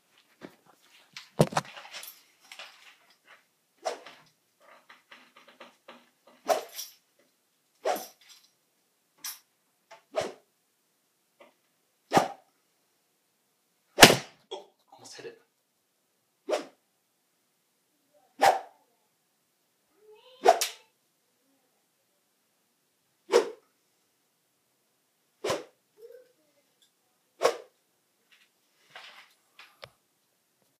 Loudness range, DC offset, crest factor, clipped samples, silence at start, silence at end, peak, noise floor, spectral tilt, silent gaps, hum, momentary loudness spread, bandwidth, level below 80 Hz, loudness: 17 LU; under 0.1%; 34 dB; under 0.1%; 0.45 s; 1.8 s; 0 dBFS; -75 dBFS; -2.5 dB/octave; none; none; 24 LU; 15.5 kHz; -62 dBFS; -26 LUFS